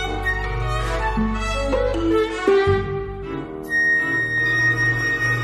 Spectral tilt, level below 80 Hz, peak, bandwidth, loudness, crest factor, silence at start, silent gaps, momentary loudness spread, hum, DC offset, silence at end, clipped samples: -5.5 dB/octave; -30 dBFS; -4 dBFS; 14.5 kHz; -20 LUFS; 16 dB; 0 s; none; 10 LU; none; under 0.1%; 0 s; under 0.1%